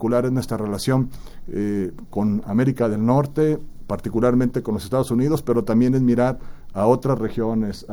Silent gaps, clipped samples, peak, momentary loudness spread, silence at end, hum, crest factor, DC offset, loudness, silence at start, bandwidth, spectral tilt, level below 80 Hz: none; under 0.1%; -4 dBFS; 9 LU; 0 s; none; 18 dB; under 0.1%; -21 LUFS; 0 s; over 20 kHz; -8 dB/octave; -40 dBFS